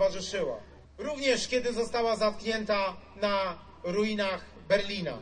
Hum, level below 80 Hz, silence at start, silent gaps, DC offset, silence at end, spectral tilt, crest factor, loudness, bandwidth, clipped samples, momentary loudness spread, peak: none; -54 dBFS; 0 s; none; under 0.1%; 0 s; -4 dB/octave; 18 dB; -30 LUFS; 10.5 kHz; under 0.1%; 8 LU; -12 dBFS